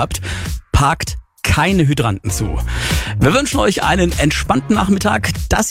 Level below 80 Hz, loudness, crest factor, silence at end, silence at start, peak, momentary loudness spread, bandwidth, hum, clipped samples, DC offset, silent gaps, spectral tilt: -24 dBFS; -16 LUFS; 16 dB; 0 s; 0 s; 0 dBFS; 7 LU; 16.5 kHz; none; under 0.1%; under 0.1%; none; -4.5 dB/octave